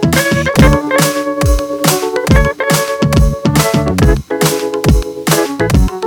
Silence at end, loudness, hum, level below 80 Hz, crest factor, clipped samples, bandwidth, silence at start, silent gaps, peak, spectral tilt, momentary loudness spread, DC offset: 0 s; -12 LUFS; none; -18 dBFS; 12 dB; 0.3%; 19.5 kHz; 0 s; none; 0 dBFS; -5 dB/octave; 4 LU; under 0.1%